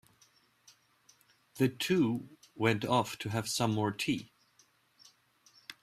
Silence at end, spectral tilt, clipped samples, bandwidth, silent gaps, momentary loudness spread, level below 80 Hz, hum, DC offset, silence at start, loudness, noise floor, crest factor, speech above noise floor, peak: 0.1 s; -5 dB/octave; under 0.1%; 15.5 kHz; none; 20 LU; -70 dBFS; none; under 0.1%; 1.55 s; -32 LUFS; -68 dBFS; 22 dB; 37 dB; -14 dBFS